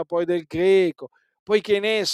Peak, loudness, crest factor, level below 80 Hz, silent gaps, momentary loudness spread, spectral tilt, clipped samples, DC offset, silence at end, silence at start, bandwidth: -6 dBFS; -21 LUFS; 16 dB; -60 dBFS; 1.39-1.46 s; 7 LU; -4.5 dB/octave; under 0.1%; under 0.1%; 0 s; 0 s; 13.5 kHz